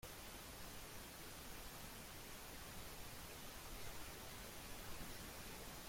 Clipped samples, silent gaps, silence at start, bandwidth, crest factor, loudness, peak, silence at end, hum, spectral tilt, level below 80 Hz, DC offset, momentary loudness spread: under 0.1%; none; 0 s; 16.5 kHz; 14 dB; -53 LUFS; -38 dBFS; 0 s; none; -2.5 dB/octave; -60 dBFS; under 0.1%; 1 LU